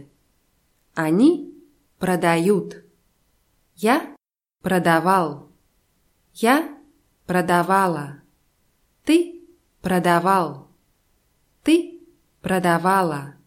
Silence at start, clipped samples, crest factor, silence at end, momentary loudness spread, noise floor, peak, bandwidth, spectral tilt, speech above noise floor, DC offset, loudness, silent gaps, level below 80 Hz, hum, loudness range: 0.95 s; under 0.1%; 18 dB; 0.15 s; 16 LU; -65 dBFS; -4 dBFS; 16.5 kHz; -6 dB/octave; 46 dB; under 0.1%; -20 LUFS; none; -60 dBFS; none; 2 LU